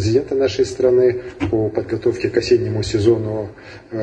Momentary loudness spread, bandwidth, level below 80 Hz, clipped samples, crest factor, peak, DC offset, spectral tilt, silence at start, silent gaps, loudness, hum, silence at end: 10 LU; 9 kHz; -42 dBFS; under 0.1%; 16 dB; -2 dBFS; under 0.1%; -6.5 dB/octave; 0 s; none; -18 LUFS; none; 0 s